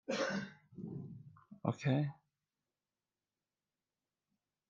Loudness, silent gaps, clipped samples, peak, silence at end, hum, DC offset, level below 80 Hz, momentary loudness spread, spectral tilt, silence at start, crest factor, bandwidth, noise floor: -39 LUFS; none; under 0.1%; -18 dBFS; 2.55 s; none; under 0.1%; -82 dBFS; 17 LU; -6.5 dB/octave; 0.1 s; 26 dB; 7.6 kHz; under -90 dBFS